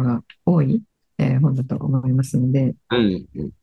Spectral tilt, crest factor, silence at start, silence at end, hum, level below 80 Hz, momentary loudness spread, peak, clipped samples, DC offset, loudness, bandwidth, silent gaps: -8 dB/octave; 14 dB; 0 s; 0.1 s; none; -50 dBFS; 6 LU; -6 dBFS; under 0.1%; under 0.1%; -20 LUFS; 12 kHz; none